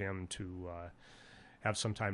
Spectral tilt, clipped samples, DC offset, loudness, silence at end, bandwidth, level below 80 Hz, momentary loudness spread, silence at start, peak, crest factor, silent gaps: -4.5 dB/octave; under 0.1%; under 0.1%; -40 LUFS; 0 s; 11.5 kHz; -58 dBFS; 21 LU; 0 s; -20 dBFS; 22 dB; none